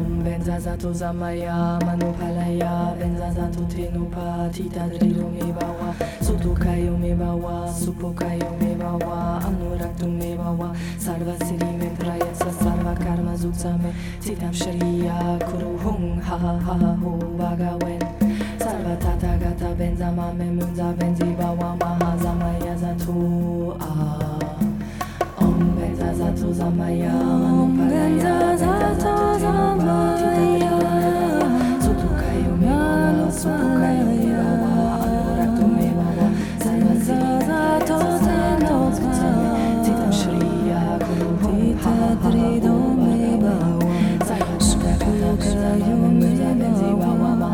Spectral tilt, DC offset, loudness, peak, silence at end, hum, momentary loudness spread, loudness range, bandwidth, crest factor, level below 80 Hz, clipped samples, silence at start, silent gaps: -7 dB/octave; under 0.1%; -21 LUFS; -6 dBFS; 0 s; none; 8 LU; 6 LU; 18 kHz; 14 dB; -32 dBFS; under 0.1%; 0 s; none